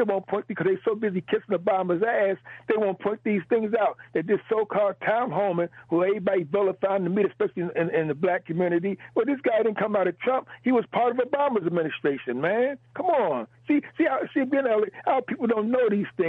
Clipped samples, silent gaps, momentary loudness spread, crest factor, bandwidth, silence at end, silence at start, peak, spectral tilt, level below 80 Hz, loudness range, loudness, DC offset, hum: under 0.1%; none; 4 LU; 14 dB; 4.2 kHz; 0 s; 0 s; -10 dBFS; -9.5 dB/octave; -72 dBFS; 1 LU; -25 LUFS; under 0.1%; none